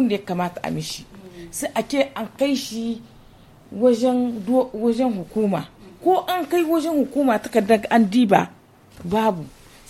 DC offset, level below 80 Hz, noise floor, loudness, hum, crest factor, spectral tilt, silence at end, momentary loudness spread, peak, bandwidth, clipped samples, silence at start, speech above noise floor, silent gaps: under 0.1%; -54 dBFS; -48 dBFS; -21 LUFS; none; 20 dB; -5.5 dB/octave; 0.4 s; 15 LU; -2 dBFS; 16 kHz; under 0.1%; 0 s; 27 dB; none